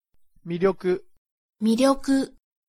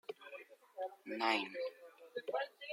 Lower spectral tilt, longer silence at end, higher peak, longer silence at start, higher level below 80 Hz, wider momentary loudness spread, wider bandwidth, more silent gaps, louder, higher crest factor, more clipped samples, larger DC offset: first, -5.5 dB/octave vs -3 dB/octave; first, 0.4 s vs 0 s; first, -8 dBFS vs -20 dBFS; first, 0.45 s vs 0.1 s; first, -52 dBFS vs under -90 dBFS; second, 11 LU vs 19 LU; about the same, 15.5 kHz vs 16.5 kHz; first, 1.18-1.25 s, 1.32-1.49 s vs none; first, -24 LUFS vs -41 LUFS; about the same, 18 dB vs 22 dB; neither; neither